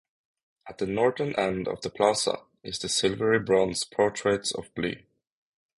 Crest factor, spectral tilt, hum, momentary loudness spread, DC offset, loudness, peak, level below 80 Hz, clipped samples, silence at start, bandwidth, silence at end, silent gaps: 20 dB; -3.5 dB/octave; none; 10 LU; under 0.1%; -27 LUFS; -8 dBFS; -58 dBFS; under 0.1%; 0.65 s; 11.5 kHz; 0.8 s; none